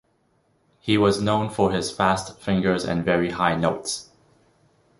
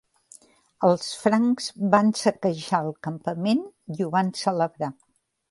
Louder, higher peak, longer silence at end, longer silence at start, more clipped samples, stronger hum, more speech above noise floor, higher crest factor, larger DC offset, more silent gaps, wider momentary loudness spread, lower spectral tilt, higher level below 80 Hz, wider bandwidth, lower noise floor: about the same, -23 LUFS vs -24 LUFS; about the same, -4 dBFS vs -2 dBFS; first, 0.95 s vs 0.6 s; about the same, 0.85 s vs 0.8 s; neither; neither; first, 44 dB vs 30 dB; about the same, 20 dB vs 22 dB; neither; neither; second, 8 LU vs 11 LU; about the same, -5 dB/octave vs -5.5 dB/octave; first, -50 dBFS vs -70 dBFS; about the same, 11.5 kHz vs 11.5 kHz; first, -66 dBFS vs -54 dBFS